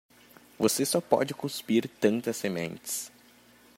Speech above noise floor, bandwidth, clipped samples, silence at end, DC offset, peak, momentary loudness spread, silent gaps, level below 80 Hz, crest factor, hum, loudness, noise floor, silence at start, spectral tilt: 29 dB; 16 kHz; under 0.1%; 0.7 s; under 0.1%; -6 dBFS; 9 LU; none; -72 dBFS; 24 dB; none; -29 LUFS; -58 dBFS; 0.6 s; -4 dB/octave